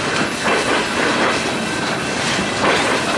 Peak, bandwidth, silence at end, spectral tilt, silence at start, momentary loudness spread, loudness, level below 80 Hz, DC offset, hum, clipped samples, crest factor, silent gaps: -4 dBFS; 11.5 kHz; 0 s; -3 dB/octave; 0 s; 4 LU; -17 LUFS; -46 dBFS; under 0.1%; none; under 0.1%; 14 dB; none